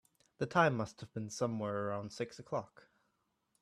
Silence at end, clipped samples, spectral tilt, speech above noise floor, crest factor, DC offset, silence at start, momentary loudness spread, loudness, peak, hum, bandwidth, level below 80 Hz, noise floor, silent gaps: 0.95 s; under 0.1%; -5.5 dB/octave; 44 dB; 24 dB; under 0.1%; 0.4 s; 13 LU; -37 LUFS; -14 dBFS; none; 13.5 kHz; -74 dBFS; -81 dBFS; none